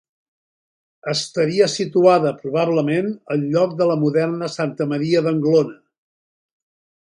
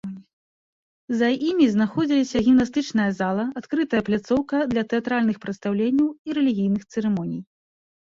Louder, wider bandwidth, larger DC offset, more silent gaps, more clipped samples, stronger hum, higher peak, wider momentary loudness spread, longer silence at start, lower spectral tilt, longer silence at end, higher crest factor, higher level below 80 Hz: first, -19 LUFS vs -22 LUFS; first, 11.5 kHz vs 7.6 kHz; neither; second, none vs 0.33-1.08 s, 6.19-6.25 s; neither; neither; first, -2 dBFS vs -6 dBFS; about the same, 8 LU vs 8 LU; first, 1.05 s vs 0.05 s; about the same, -6 dB/octave vs -6.5 dB/octave; first, 1.35 s vs 0.75 s; about the same, 18 dB vs 16 dB; second, -66 dBFS vs -56 dBFS